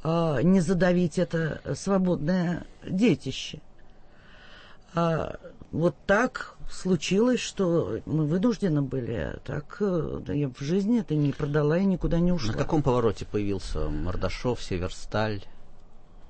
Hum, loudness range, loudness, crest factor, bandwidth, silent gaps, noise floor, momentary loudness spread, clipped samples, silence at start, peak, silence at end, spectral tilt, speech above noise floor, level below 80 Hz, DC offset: none; 4 LU; -27 LUFS; 16 dB; 8.8 kHz; none; -48 dBFS; 10 LU; under 0.1%; 0 s; -10 dBFS; 0 s; -6.5 dB/octave; 23 dB; -40 dBFS; under 0.1%